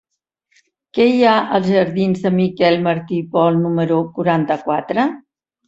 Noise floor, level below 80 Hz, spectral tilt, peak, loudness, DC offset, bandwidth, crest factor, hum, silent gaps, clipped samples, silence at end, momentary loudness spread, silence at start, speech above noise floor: -68 dBFS; -60 dBFS; -8 dB/octave; -2 dBFS; -16 LUFS; under 0.1%; 7.8 kHz; 16 dB; none; none; under 0.1%; 0.5 s; 6 LU; 0.95 s; 53 dB